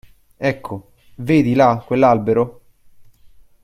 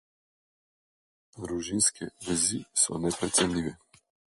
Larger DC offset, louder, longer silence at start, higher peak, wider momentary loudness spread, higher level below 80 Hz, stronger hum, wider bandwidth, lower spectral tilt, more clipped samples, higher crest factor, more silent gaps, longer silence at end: neither; first, -17 LUFS vs -27 LUFS; second, 0.4 s vs 1.35 s; first, -2 dBFS vs -10 dBFS; first, 16 LU vs 12 LU; first, -50 dBFS vs -56 dBFS; neither; first, 15 kHz vs 12 kHz; first, -8 dB/octave vs -2.5 dB/octave; neither; second, 16 dB vs 22 dB; neither; about the same, 0.6 s vs 0.6 s